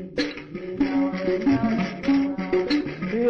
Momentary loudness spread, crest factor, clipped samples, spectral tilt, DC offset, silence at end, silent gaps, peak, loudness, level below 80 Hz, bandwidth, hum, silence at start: 7 LU; 12 dB; under 0.1%; -7 dB/octave; under 0.1%; 0 s; none; -12 dBFS; -24 LUFS; -50 dBFS; 6.8 kHz; none; 0 s